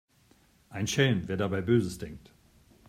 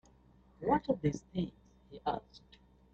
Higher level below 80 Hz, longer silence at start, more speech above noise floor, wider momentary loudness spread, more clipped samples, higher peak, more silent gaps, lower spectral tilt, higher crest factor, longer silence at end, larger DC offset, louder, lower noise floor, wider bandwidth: about the same, -58 dBFS vs -60 dBFS; about the same, 0.7 s vs 0.6 s; first, 35 dB vs 28 dB; first, 17 LU vs 11 LU; neither; first, -10 dBFS vs -18 dBFS; neither; second, -5.5 dB/octave vs -7.5 dB/octave; about the same, 20 dB vs 20 dB; first, 0.7 s vs 0.55 s; neither; first, -28 LUFS vs -36 LUFS; about the same, -63 dBFS vs -64 dBFS; first, 16 kHz vs 8.2 kHz